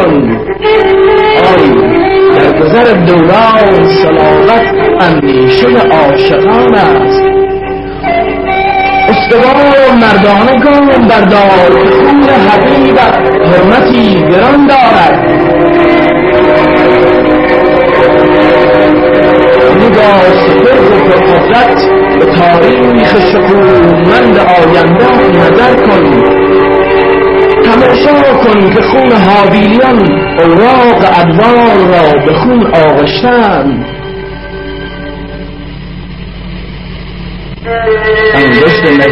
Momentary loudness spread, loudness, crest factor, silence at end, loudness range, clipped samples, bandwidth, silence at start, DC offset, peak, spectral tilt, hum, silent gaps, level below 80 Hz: 11 LU; -5 LUFS; 4 dB; 0 s; 5 LU; 2%; 7 kHz; 0 s; under 0.1%; 0 dBFS; -7.5 dB/octave; none; none; -28 dBFS